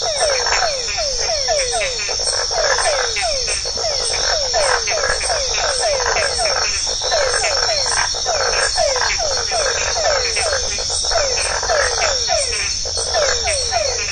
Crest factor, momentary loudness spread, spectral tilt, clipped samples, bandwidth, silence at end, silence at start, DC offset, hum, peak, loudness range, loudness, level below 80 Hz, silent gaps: 16 dB; 3 LU; 0.5 dB/octave; under 0.1%; 9.4 kHz; 0 s; 0 s; 0.4%; none; -2 dBFS; 1 LU; -16 LUFS; -34 dBFS; none